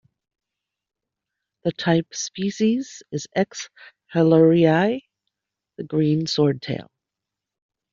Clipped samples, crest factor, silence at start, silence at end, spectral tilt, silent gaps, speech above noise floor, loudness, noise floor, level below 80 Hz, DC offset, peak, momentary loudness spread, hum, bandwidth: under 0.1%; 20 dB; 1.65 s; 1.1 s; -6 dB/octave; none; 65 dB; -21 LUFS; -86 dBFS; -62 dBFS; under 0.1%; -4 dBFS; 16 LU; none; 7.6 kHz